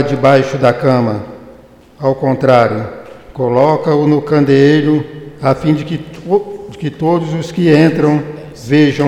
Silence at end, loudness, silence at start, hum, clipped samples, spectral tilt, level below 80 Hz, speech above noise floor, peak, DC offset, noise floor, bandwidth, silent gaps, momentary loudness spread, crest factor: 0 s; -13 LUFS; 0 s; none; under 0.1%; -7.5 dB/octave; -46 dBFS; 28 dB; 0 dBFS; under 0.1%; -40 dBFS; 11.5 kHz; none; 14 LU; 12 dB